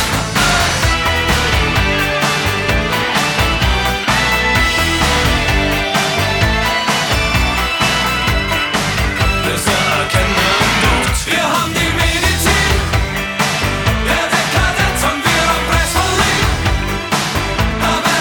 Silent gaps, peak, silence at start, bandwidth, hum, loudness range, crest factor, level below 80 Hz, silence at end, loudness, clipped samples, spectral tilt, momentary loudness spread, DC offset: none; 0 dBFS; 0 s; over 20 kHz; none; 1 LU; 14 dB; -22 dBFS; 0 s; -14 LUFS; under 0.1%; -3.5 dB/octave; 3 LU; under 0.1%